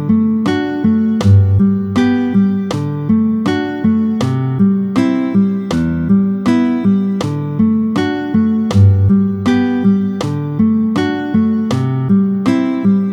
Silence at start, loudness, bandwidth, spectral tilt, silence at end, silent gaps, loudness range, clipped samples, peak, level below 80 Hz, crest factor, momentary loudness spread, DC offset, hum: 0 s; -14 LUFS; 9.6 kHz; -8 dB/octave; 0 s; none; 1 LU; under 0.1%; 0 dBFS; -42 dBFS; 12 dB; 6 LU; under 0.1%; none